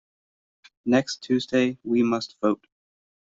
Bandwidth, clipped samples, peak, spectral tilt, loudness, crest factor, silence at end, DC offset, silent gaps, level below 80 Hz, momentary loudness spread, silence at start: 7.8 kHz; under 0.1%; -8 dBFS; -5.5 dB/octave; -25 LUFS; 18 dB; 0.85 s; under 0.1%; none; -66 dBFS; 4 LU; 0.85 s